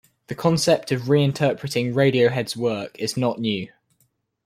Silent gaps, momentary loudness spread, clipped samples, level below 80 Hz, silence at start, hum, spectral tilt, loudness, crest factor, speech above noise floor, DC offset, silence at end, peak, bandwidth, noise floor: none; 9 LU; under 0.1%; -60 dBFS; 0.3 s; none; -5.5 dB/octave; -22 LUFS; 18 dB; 46 dB; under 0.1%; 0.8 s; -4 dBFS; 15.5 kHz; -68 dBFS